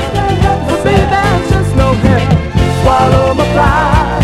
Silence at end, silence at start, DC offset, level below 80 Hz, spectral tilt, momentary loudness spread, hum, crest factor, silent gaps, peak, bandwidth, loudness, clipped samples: 0 s; 0 s; under 0.1%; -18 dBFS; -6.5 dB/octave; 3 LU; none; 10 dB; none; 0 dBFS; 14 kHz; -10 LUFS; 0.3%